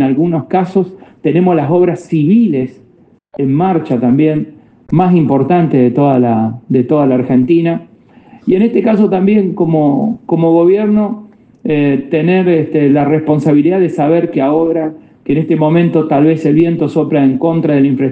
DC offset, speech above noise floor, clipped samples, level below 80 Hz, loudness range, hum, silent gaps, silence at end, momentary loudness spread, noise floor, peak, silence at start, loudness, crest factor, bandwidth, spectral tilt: under 0.1%; 36 dB; under 0.1%; -52 dBFS; 2 LU; none; none; 0 s; 7 LU; -47 dBFS; 0 dBFS; 0 s; -12 LUFS; 12 dB; 8 kHz; -10 dB/octave